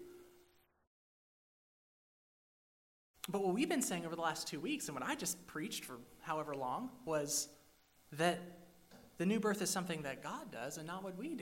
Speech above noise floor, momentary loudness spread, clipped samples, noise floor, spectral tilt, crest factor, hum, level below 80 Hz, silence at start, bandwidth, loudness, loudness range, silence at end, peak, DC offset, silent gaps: 31 dB; 10 LU; under 0.1%; -71 dBFS; -3.5 dB/octave; 22 dB; none; -76 dBFS; 0 s; 16 kHz; -40 LUFS; 3 LU; 0 s; -20 dBFS; under 0.1%; 0.87-3.14 s